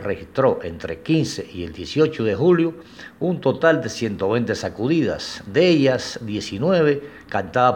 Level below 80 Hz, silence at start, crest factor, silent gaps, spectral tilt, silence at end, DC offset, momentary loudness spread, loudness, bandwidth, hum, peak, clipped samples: -52 dBFS; 0 s; 18 dB; none; -6 dB/octave; 0 s; under 0.1%; 11 LU; -21 LUFS; 16 kHz; none; -2 dBFS; under 0.1%